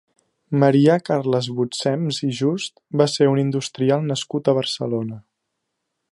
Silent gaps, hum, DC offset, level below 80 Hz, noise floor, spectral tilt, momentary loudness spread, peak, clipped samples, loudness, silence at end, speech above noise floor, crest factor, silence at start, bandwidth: none; none; under 0.1%; -68 dBFS; -77 dBFS; -6 dB/octave; 9 LU; -2 dBFS; under 0.1%; -20 LUFS; 0.9 s; 58 dB; 18 dB; 0.5 s; 11.5 kHz